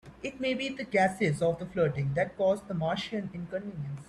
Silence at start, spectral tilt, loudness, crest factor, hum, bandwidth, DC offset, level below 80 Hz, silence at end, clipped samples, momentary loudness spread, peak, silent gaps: 0.05 s; -6.5 dB/octave; -30 LUFS; 18 dB; none; 12.5 kHz; under 0.1%; -60 dBFS; 0.05 s; under 0.1%; 10 LU; -14 dBFS; none